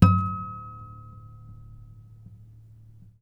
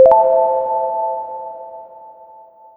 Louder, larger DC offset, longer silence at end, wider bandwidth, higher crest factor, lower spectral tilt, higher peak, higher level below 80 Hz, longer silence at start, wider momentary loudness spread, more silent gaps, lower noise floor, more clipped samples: second, -27 LUFS vs -16 LUFS; neither; first, 1.7 s vs 0.65 s; first, 5.6 kHz vs 3 kHz; first, 26 dB vs 16 dB; about the same, -8.5 dB/octave vs -8 dB/octave; about the same, -2 dBFS vs 0 dBFS; first, -48 dBFS vs -58 dBFS; about the same, 0 s vs 0 s; about the same, 23 LU vs 23 LU; neither; first, -50 dBFS vs -43 dBFS; neither